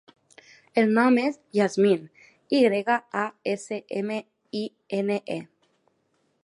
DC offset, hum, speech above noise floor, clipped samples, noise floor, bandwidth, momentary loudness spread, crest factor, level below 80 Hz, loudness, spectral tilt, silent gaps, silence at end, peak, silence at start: under 0.1%; none; 47 dB; under 0.1%; -71 dBFS; 11 kHz; 13 LU; 18 dB; -78 dBFS; -25 LUFS; -6 dB/octave; none; 1 s; -8 dBFS; 0.75 s